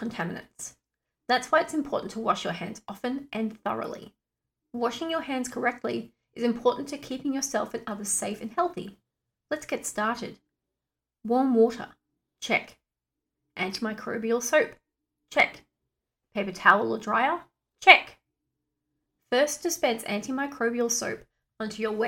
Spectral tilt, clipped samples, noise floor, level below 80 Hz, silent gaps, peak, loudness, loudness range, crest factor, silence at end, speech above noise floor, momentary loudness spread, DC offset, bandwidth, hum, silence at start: -2.5 dB/octave; under 0.1%; -88 dBFS; -66 dBFS; none; 0 dBFS; -27 LUFS; 9 LU; 28 dB; 0 s; 61 dB; 16 LU; under 0.1%; 17.5 kHz; none; 0 s